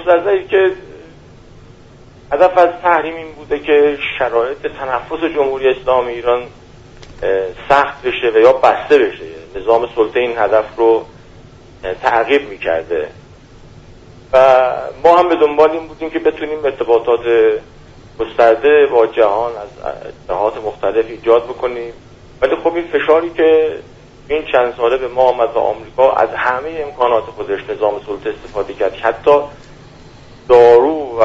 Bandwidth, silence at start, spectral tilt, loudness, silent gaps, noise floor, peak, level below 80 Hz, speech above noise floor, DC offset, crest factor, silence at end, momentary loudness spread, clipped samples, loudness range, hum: 7.6 kHz; 0 s; -6 dB/octave; -14 LUFS; none; -40 dBFS; 0 dBFS; -44 dBFS; 27 dB; under 0.1%; 14 dB; 0 s; 13 LU; under 0.1%; 4 LU; none